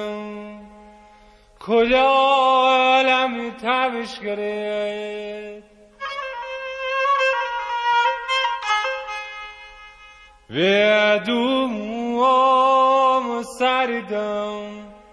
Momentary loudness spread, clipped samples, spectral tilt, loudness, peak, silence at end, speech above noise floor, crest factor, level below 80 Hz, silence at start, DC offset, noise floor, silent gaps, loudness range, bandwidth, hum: 17 LU; under 0.1%; -4 dB/octave; -19 LUFS; -6 dBFS; 0.15 s; 31 dB; 16 dB; -56 dBFS; 0 s; under 0.1%; -50 dBFS; none; 7 LU; 11 kHz; none